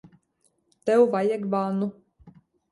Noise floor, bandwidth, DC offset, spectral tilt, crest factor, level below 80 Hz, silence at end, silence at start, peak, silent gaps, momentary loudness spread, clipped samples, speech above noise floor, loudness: -70 dBFS; 11.5 kHz; under 0.1%; -7.5 dB/octave; 18 dB; -68 dBFS; 0.4 s; 0.85 s; -8 dBFS; none; 11 LU; under 0.1%; 47 dB; -24 LUFS